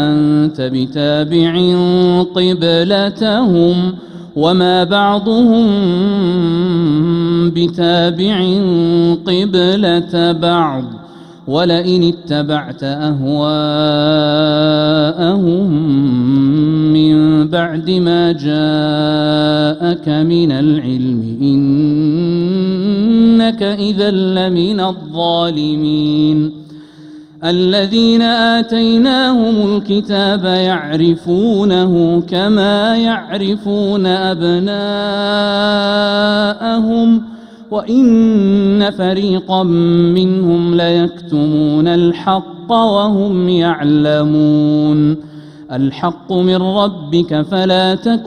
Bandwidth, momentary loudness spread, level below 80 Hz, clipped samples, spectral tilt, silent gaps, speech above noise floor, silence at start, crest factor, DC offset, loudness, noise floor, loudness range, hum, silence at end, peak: 9.6 kHz; 6 LU; -46 dBFS; under 0.1%; -7.5 dB/octave; none; 23 dB; 0 s; 12 dB; under 0.1%; -13 LUFS; -35 dBFS; 2 LU; none; 0 s; 0 dBFS